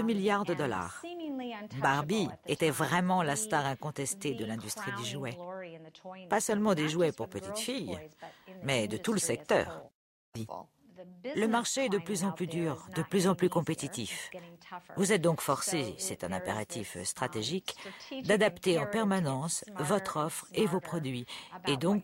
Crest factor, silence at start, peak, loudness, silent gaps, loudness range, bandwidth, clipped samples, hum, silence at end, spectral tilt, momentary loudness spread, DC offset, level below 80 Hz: 20 dB; 0 s; -14 dBFS; -32 LUFS; 9.95-10.32 s; 3 LU; 16 kHz; under 0.1%; none; 0 s; -4.5 dB/octave; 14 LU; under 0.1%; -68 dBFS